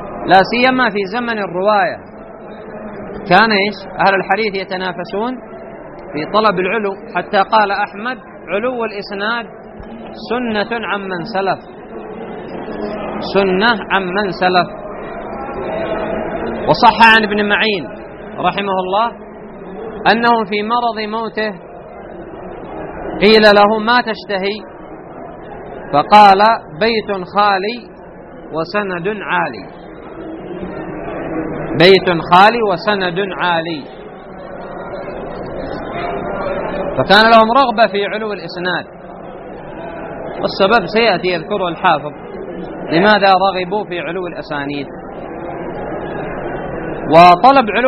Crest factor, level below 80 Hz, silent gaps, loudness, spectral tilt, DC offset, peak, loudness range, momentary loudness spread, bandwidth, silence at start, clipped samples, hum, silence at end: 16 dB; -42 dBFS; none; -14 LUFS; -6 dB/octave; under 0.1%; 0 dBFS; 8 LU; 22 LU; 11.5 kHz; 0 s; 0.1%; none; 0 s